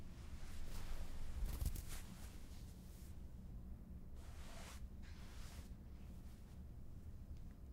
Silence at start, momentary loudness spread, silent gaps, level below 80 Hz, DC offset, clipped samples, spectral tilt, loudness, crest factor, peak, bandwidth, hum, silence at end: 0 s; 9 LU; none; -52 dBFS; under 0.1%; under 0.1%; -5 dB/octave; -55 LUFS; 20 dB; -30 dBFS; 16 kHz; none; 0 s